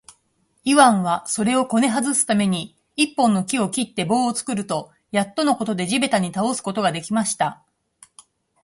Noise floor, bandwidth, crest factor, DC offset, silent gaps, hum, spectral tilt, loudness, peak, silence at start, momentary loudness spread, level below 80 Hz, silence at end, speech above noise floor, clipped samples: -66 dBFS; 11.5 kHz; 20 dB; under 0.1%; none; none; -4 dB/octave; -20 LUFS; 0 dBFS; 0.65 s; 8 LU; -64 dBFS; 1.1 s; 46 dB; under 0.1%